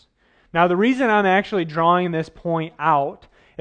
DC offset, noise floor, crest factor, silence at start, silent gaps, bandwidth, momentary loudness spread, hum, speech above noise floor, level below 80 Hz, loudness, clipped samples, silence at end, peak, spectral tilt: under 0.1%; -59 dBFS; 18 dB; 0.55 s; none; 9.4 kHz; 8 LU; none; 40 dB; -58 dBFS; -19 LUFS; under 0.1%; 0.45 s; -2 dBFS; -7 dB/octave